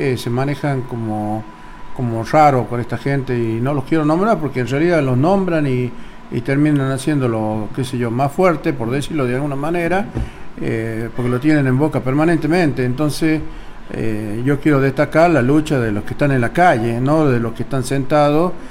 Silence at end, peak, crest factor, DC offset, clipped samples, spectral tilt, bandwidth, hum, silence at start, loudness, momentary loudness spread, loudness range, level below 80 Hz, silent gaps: 0 s; -2 dBFS; 16 dB; under 0.1%; under 0.1%; -7.5 dB/octave; 15.5 kHz; none; 0 s; -17 LUFS; 10 LU; 3 LU; -36 dBFS; none